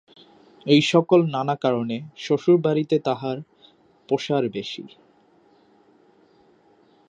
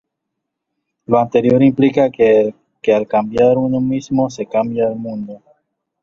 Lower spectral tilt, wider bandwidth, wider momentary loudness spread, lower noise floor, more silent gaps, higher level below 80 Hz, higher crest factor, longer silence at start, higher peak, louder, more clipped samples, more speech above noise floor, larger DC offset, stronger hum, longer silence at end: about the same, -6.5 dB/octave vs -7.5 dB/octave; first, 9 kHz vs 7.2 kHz; first, 14 LU vs 10 LU; second, -58 dBFS vs -77 dBFS; neither; second, -72 dBFS vs -52 dBFS; about the same, 20 dB vs 16 dB; second, 0.65 s vs 1.1 s; second, -4 dBFS vs 0 dBFS; second, -22 LUFS vs -15 LUFS; neither; second, 37 dB vs 63 dB; neither; neither; first, 2.2 s vs 0.65 s